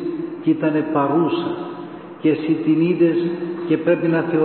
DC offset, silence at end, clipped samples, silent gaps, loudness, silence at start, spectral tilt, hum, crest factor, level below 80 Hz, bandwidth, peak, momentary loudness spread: under 0.1%; 0 s; under 0.1%; none; -19 LUFS; 0 s; -12.5 dB/octave; none; 14 dB; -66 dBFS; 4.4 kHz; -6 dBFS; 9 LU